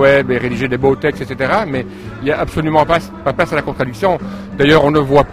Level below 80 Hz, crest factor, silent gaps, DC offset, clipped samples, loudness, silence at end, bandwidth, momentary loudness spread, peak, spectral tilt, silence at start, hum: -36 dBFS; 14 dB; none; 0.1%; under 0.1%; -15 LUFS; 0 s; 15.5 kHz; 10 LU; 0 dBFS; -6.5 dB/octave; 0 s; none